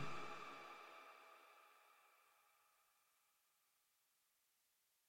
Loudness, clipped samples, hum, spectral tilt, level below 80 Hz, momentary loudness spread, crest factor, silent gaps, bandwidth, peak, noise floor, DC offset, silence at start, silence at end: -57 LUFS; under 0.1%; none; -4 dB/octave; -88 dBFS; 15 LU; 20 dB; none; 16.5 kHz; -36 dBFS; -84 dBFS; under 0.1%; 0 s; 0 s